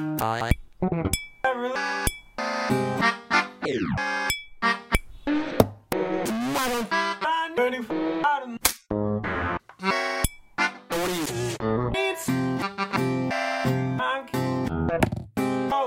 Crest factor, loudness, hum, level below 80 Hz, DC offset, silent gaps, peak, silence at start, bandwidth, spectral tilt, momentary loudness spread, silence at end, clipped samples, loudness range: 26 dB; -26 LUFS; none; -42 dBFS; under 0.1%; none; 0 dBFS; 0 s; 16.5 kHz; -4.5 dB/octave; 5 LU; 0 s; under 0.1%; 1 LU